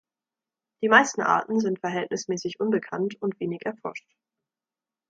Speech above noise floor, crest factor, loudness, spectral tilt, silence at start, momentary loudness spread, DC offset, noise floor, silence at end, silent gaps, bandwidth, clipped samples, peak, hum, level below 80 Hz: over 65 dB; 24 dB; -25 LUFS; -4.5 dB/octave; 0.8 s; 14 LU; under 0.1%; under -90 dBFS; 1.1 s; none; 9 kHz; under 0.1%; -4 dBFS; none; -76 dBFS